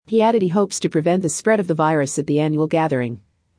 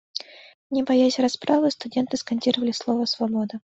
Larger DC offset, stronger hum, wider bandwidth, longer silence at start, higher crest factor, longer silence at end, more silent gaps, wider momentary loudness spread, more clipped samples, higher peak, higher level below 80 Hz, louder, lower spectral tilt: neither; neither; first, 10.5 kHz vs 8 kHz; about the same, 0.1 s vs 0.15 s; about the same, 14 dB vs 18 dB; first, 0.4 s vs 0.15 s; second, none vs 0.54-0.70 s; second, 4 LU vs 9 LU; neither; about the same, -4 dBFS vs -6 dBFS; about the same, -64 dBFS vs -66 dBFS; first, -19 LUFS vs -23 LUFS; about the same, -5.5 dB/octave vs -4.5 dB/octave